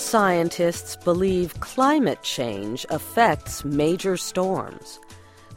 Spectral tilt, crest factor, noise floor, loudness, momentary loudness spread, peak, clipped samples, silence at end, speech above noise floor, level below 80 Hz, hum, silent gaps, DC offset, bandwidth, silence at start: -4.5 dB/octave; 18 dB; -45 dBFS; -23 LUFS; 10 LU; -4 dBFS; under 0.1%; 0 s; 23 dB; -48 dBFS; none; none; under 0.1%; 16.5 kHz; 0 s